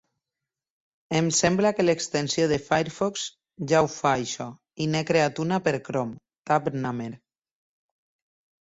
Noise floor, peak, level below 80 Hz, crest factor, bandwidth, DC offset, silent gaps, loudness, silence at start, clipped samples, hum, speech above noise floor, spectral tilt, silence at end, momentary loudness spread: -88 dBFS; -6 dBFS; -60 dBFS; 20 dB; 8.2 kHz; under 0.1%; 6.38-6.43 s; -25 LUFS; 1.1 s; under 0.1%; none; 64 dB; -4.5 dB/octave; 1.45 s; 13 LU